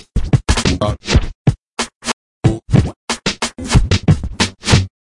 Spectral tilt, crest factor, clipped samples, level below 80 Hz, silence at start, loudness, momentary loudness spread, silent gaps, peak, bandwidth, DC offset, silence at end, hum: -5 dB/octave; 16 dB; under 0.1%; -24 dBFS; 0.15 s; -17 LUFS; 8 LU; 1.35-1.45 s, 1.72-1.77 s, 1.95-2.01 s, 2.13-2.42 s, 2.96-3.08 s; 0 dBFS; 11.5 kHz; under 0.1%; 0.15 s; none